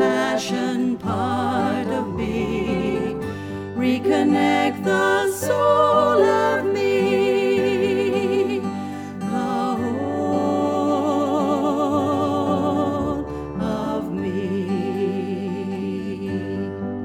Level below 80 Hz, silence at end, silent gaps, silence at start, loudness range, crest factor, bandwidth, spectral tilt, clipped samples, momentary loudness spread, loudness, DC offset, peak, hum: -48 dBFS; 0 s; none; 0 s; 6 LU; 16 dB; 17.5 kHz; -6 dB/octave; under 0.1%; 9 LU; -21 LUFS; under 0.1%; -4 dBFS; none